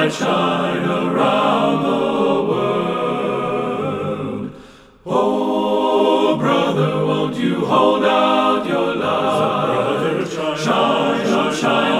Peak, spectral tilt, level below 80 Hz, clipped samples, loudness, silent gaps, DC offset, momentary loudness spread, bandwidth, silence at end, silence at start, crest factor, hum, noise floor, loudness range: -2 dBFS; -5.5 dB/octave; -54 dBFS; under 0.1%; -17 LUFS; none; under 0.1%; 7 LU; 15 kHz; 0 s; 0 s; 16 dB; none; -42 dBFS; 4 LU